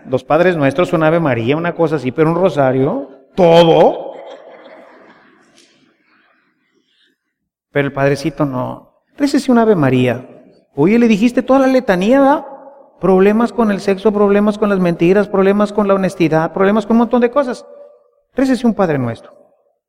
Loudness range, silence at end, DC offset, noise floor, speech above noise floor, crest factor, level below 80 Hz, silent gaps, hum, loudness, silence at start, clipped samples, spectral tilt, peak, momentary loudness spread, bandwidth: 8 LU; 0.7 s; under 0.1%; -74 dBFS; 62 dB; 14 dB; -48 dBFS; none; none; -13 LUFS; 0.05 s; under 0.1%; -7 dB/octave; 0 dBFS; 11 LU; 15 kHz